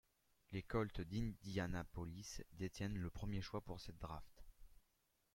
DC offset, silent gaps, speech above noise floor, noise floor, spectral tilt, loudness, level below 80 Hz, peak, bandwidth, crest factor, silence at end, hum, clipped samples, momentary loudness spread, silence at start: under 0.1%; none; 37 dB; -83 dBFS; -6 dB/octave; -48 LUFS; -58 dBFS; -28 dBFS; 16.5 kHz; 20 dB; 0.6 s; none; under 0.1%; 10 LU; 0.5 s